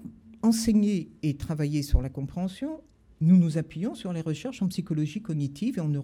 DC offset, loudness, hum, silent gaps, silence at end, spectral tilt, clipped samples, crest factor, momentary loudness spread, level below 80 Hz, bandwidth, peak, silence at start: under 0.1%; -27 LUFS; none; none; 0 s; -7 dB/octave; under 0.1%; 18 dB; 11 LU; -38 dBFS; 15 kHz; -8 dBFS; 0 s